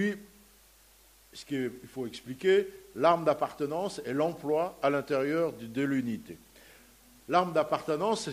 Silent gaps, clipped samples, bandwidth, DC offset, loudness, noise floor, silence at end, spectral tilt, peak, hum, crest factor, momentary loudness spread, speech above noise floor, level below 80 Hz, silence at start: none; under 0.1%; 15.5 kHz; under 0.1%; -30 LUFS; -60 dBFS; 0 s; -5.5 dB/octave; -10 dBFS; none; 20 dB; 14 LU; 30 dB; -66 dBFS; 0 s